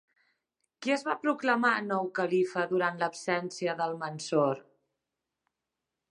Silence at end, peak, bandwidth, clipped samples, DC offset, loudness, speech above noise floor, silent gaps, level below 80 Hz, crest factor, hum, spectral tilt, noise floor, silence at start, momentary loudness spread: 1.5 s; -12 dBFS; 11 kHz; under 0.1%; under 0.1%; -30 LUFS; 58 dB; none; -82 dBFS; 20 dB; none; -5 dB/octave; -87 dBFS; 0.8 s; 7 LU